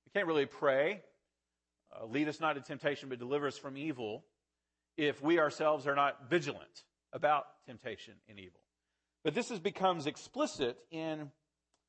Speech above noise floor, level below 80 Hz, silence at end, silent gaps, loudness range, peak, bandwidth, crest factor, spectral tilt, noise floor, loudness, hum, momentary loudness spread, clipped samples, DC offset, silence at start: 54 dB; -78 dBFS; 0.6 s; none; 5 LU; -18 dBFS; 8.4 kHz; 20 dB; -5 dB/octave; -89 dBFS; -35 LUFS; none; 18 LU; under 0.1%; under 0.1%; 0.15 s